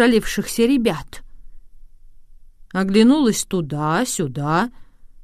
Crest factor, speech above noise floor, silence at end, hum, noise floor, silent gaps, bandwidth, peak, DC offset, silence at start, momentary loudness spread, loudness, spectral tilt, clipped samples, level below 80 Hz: 18 dB; 24 dB; 0 s; none; -42 dBFS; none; 15.5 kHz; -2 dBFS; under 0.1%; 0 s; 12 LU; -19 LUFS; -5 dB/octave; under 0.1%; -42 dBFS